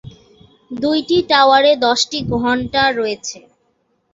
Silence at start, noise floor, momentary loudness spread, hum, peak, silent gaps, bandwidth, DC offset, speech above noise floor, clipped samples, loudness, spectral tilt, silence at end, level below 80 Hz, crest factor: 0.05 s; -64 dBFS; 12 LU; none; -2 dBFS; none; 8 kHz; under 0.1%; 49 dB; under 0.1%; -15 LUFS; -3.5 dB/octave; 0.75 s; -46 dBFS; 16 dB